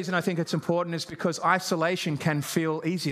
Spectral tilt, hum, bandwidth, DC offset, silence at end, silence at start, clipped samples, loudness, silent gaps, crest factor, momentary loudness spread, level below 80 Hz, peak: -5 dB/octave; none; 15.5 kHz; under 0.1%; 0 s; 0 s; under 0.1%; -27 LUFS; none; 20 dB; 5 LU; -70 dBFS; -8 dBFS